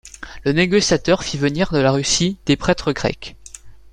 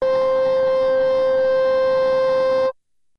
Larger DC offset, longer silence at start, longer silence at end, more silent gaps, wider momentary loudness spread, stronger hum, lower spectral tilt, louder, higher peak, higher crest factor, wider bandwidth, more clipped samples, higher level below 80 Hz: neither; about the same, 0.05 s vs 0 s; second, 0.05 s vs 0.45 s; neither; first, 9 LU vs 1 LU; neither; about the same, -4.5 dB/octave vs -5 dB/octave; about the same, -18 LUFS vs -18 LUFS; first, -2 dBFS vs -12 dBFS; first, 18 dB vs 6 dB; first, 11.5 kHz vs 6.4 kHz; neither; first, -40 dBFS vs -52 dBFS